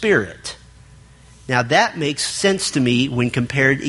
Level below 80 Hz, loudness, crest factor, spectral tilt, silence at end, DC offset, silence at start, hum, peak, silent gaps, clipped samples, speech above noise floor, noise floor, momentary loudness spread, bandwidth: -48 dBFS; -18 LUFS; 20 dB; -4 dB/octave; 0 s; under 0.1%; 0 s; none; 0 dBFS; none; under 0.1%; 27 dB; -45 dBFS; 13 LU; 11.5 kHz